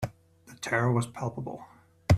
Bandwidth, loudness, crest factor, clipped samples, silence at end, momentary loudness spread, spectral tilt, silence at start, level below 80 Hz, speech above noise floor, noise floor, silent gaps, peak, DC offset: 14.5 kHz; -31 LUFS; 22 dB; under 0.1%; 0 s; 14 LU; -6.5 dB/octave; 0 s; -54 dBFS; 25 dB; -55 dBFS; none; -8 dBFS; under 0.1%